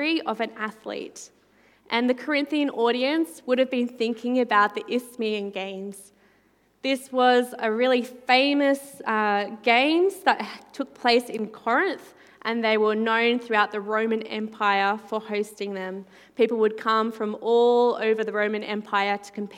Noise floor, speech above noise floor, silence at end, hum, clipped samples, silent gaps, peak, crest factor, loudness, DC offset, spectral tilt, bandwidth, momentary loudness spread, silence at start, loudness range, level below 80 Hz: -63 dBFS; 39 dB; 0 s; none; under 0.1%; none; -4 dBFS; 22 dB; -24 LUFS; under 0.1%; -4.5 dB/octave; 16 kHz; 13 LU; 0 s; 4 LU; -78 dBFS